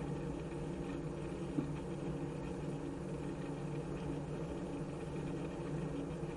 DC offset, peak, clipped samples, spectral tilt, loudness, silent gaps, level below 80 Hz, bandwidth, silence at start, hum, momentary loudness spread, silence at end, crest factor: under 0.1%; -22 dBFS; under 0.1%; -7.5 dB/octave; -42 LUFS; none; -54 dBFS; 11.5 kHz; 0 s; none; 2 LU; 0 s; 18 dB